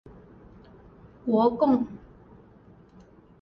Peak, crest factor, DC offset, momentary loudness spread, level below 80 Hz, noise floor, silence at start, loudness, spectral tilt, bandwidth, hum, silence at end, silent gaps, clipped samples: -10 dBFS; 20 dB; under 0.1%; 15 LU; -58 dBFS; -53 dBFS; 1.25 s; -25 LUFS; -9.5 dB/octave; 5.4 kHz; none; 1.45 s; none; under 0.1%